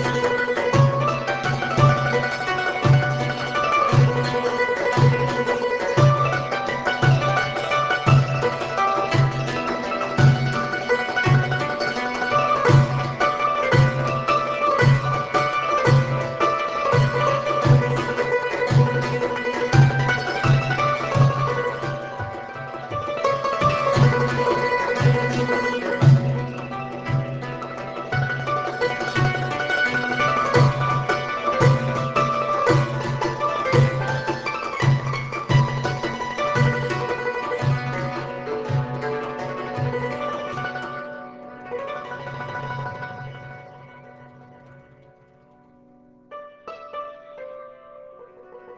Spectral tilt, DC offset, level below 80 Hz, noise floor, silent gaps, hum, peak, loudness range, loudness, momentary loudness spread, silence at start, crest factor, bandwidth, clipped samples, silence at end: -6.5 dB/octave; under 0.1%; -46 dBFS; -53 dBFS; none; none; -2 dBFS; 11 LU; -21 LUFS; 13 LU; 0 s; 18 dB; 8 kHz; under 0.1%; 0 s